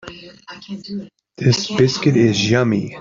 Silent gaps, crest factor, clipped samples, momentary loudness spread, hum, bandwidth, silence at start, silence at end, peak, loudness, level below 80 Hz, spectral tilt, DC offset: none; 16 dB; under 0.1%; 22 LU; none; 7.6 kHz; 0.05 s; 0 s; -2 dBFS; -16 LUFS; -52 dBFS; -5.5 dB/octave; under 0.1%